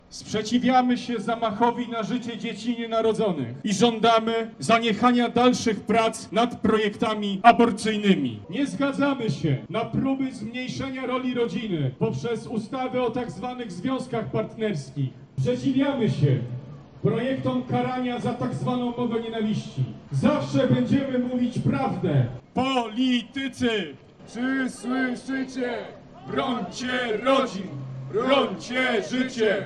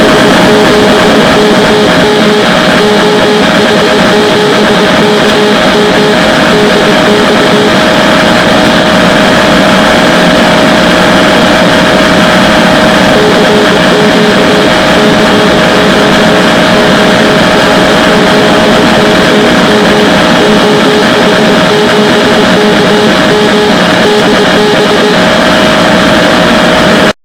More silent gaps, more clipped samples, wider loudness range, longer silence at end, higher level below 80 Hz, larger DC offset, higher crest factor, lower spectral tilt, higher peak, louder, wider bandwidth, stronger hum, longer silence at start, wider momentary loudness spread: neither; second, under 0.1% vs 9%; first, 6 LU vs 1 LU; second, 0 s vs 0.15 s; second, -58 dBFS vs -30 dBFS; neither; first, 24 dB vs 4 dB; first, -6 dB/octave vs -4.5 dB/octave; about the same, 0 dBFS vs 0 dBFS; second, -25 LUFS vs -4 LUFS; second, 11 kHz vs over 20 kHz; neither; about the same, 0.1 s vs 0 s; first, 10 LU vs 1 LU